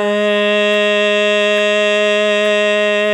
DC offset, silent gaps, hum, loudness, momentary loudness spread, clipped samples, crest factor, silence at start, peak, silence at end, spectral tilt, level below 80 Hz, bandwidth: under 0.1%; none; none; -13 LUFS; 1 LU; under 0.1%; 10 dB; 0 s; -4 dBFS; 0 s; -3.5 dB/octave; -80 dBFS; 11.5 kHz